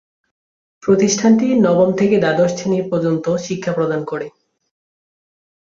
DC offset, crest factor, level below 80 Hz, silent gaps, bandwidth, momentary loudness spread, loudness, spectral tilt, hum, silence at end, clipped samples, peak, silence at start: under 0.1%; 16 dB; -58 dBFS; none; 7.6 kHz; 10 LU; -16 LUFS; -5.5 dB/octave; none; 1.4 s; under 0.1%; -2 dBFS; 0.85 s